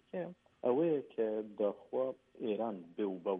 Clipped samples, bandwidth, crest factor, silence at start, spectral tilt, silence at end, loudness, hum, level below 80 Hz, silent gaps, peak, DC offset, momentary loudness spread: under 0.1%; 3.8 kHz; 16 dB; 0.15 s; -9.5 dB/octave; 0 s; -37 LUFS; none; -84 dBFS; none; -20 dBFS; under 0.1%; 10 LU